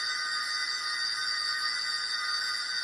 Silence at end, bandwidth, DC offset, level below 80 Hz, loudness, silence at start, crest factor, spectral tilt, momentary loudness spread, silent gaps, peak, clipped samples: 0 s; 11.5 kHz; under 0.1%; -76 dBFS; -29 LUFS; 0 s; 14 dB; 3 dB/octave; 1 LU; none; -18 dBFS; under 0.1%